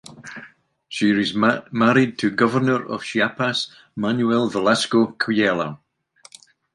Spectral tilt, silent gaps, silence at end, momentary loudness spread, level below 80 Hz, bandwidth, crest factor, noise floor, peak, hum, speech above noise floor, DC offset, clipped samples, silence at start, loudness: -5 dB/octave; none; 1 s; 12 LU; -62 dBFS; 11.5 kHz; 18 dB; -53 dBFS; -2 dBFS; none; 33 dB; under 0.1%; under 0.1%; 0.1 s; -20 LUFS